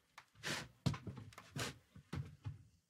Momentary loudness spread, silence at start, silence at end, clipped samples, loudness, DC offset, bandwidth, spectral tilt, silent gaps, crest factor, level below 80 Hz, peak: 12 LU; 0.15 s; 0.2 s; under 0.1%; -47 LUFS; under 0.1%; 16 kHz; -4.5 dB/octave; none; 24 dB; -66 dBFS; -24 dBFS